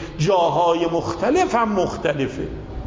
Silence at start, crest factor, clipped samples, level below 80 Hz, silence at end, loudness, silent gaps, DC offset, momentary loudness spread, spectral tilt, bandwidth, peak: 0 s; 14 dB; under 0.1%; -40 dBFS; 0 s; -20 LUFS; none; under 0.1%; 8 LU; -6 dB/octave; 7.8 kHz; -6 dBFS